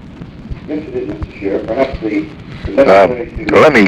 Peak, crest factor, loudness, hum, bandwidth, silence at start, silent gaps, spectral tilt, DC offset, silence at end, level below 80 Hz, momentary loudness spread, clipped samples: 0 dBFS; 12 dB; -14 LUFS; none; 12 kHz; 0 s; none; -6.5 dB/octave; under 0.1%; 0 s; -32 dBFS; 21 LU; under 0.1%